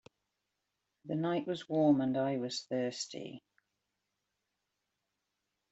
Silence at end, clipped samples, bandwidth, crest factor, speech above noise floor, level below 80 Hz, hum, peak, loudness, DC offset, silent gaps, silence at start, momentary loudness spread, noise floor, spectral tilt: 2.3 s; under 0.1%; 8.2 kHz; 20 dB; 52 dB; -80 dBFS; 50 Hz at -70 dBFS; -18 dBFS; -34 LUFS; under 0.1%; none; 1.05 s; 18 LU; -86 dBFS; -5.5 dB/octave